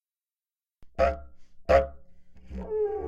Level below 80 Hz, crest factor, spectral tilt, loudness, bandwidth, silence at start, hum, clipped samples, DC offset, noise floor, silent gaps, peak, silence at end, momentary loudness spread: -42 dBFS; 22 dB; -7 dB/octave; -27 LUFS; 7.8 kHz; 0.8 s; none; under 0.1%; under 0.1%; under -90 dBFS; none; -8 dBFS; 0 s; 19 LU